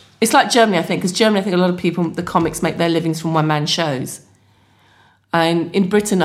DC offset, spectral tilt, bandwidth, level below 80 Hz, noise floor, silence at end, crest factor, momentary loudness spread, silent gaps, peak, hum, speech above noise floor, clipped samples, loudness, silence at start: under 0.1%; -4.5 dB/octave; 16 kHz; -52 dBFS; -54 dBFS; 0 s; 18 dB; 8 LU; none; 0 dBFS; none; 37 dB; under 0.1%; -17 LUFS; 0.2 s